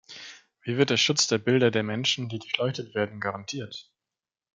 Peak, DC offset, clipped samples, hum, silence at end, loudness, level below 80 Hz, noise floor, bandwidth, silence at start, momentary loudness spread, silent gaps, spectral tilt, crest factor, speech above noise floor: -6 dBFS; under 0.1%; under 0.1%; none; 0.75 s; -26 LUFS; -72 dBFS; under -90 dBFS; 9.6 kHz; 0.1 s; 19 LU; none; -3.5 dB/octave; 22 dB; over 64 dB